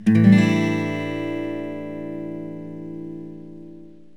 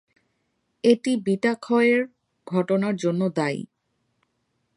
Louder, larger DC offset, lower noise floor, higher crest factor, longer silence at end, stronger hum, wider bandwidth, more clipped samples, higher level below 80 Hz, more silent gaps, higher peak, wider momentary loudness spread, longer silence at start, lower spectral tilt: about the same, -21 LUFS vs -23 LUFS; first, 0.5% vs under 0.1%; second, -44 dBFS vs -73 dBFS; about the same, 20 dB vs 20 dB; second, 0.25 s vs 1.1 s; neither; about the same, 10 kHz vs 11 kHz; neither; first, -68 dBFS vs -74 dBFS; neither; about the same, -2 dBFS vs -4 dBFS; first, 24 LU vs 8 LU; second, 0 s vs 0.85 s; first, -8 dB/octave vs -6.5 dB/octave